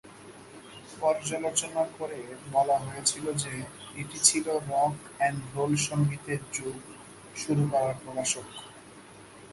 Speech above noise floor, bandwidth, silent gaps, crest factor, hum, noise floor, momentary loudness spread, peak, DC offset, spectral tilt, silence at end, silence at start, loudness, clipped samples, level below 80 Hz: 20 dB; 12 kHz; none; 26 dB; none; -50 dBFS; 21 LU; -4 dBFS; under 0.1%; -3.5 dB/octave; 0 s; 0.05 s; -29 LUFS; under 0.1%; -64 dBFS